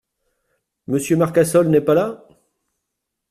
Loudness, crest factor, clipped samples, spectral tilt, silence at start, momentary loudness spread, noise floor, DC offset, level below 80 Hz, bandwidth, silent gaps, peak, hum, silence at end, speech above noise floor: -17 LUFS; 18 dB; under 0.1%; -6.5 dB/octave; 0.9 s; 10 LU; -79 dBFS; under 0.1%; -58 dBFS; 14.5 kHz; none; -2 dBFS; none; 1.15 s; 63 dB